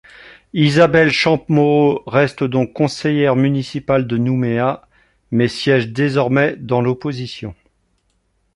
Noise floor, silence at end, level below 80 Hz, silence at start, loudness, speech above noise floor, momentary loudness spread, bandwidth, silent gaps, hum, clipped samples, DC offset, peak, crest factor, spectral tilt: -64 dBFS; 1.05 s; -50 dBFS; 0.25 s; -16 LUFS; 48 dB; 10 LU; 11.5 kHz; none; none; under 0.1%; under 0.1%; -2 dBFS; 16 dB; -7 dB/octave